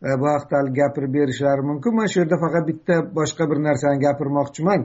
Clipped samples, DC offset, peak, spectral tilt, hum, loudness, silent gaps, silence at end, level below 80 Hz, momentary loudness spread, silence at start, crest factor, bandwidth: under 0.1%; under 0.1%; -6 dBFS; -6.5 dB/octave; none; -20 LUFS; none; 0 s; -58 dBFS; 2 LU; 0 s; 14 dB; 8 kHz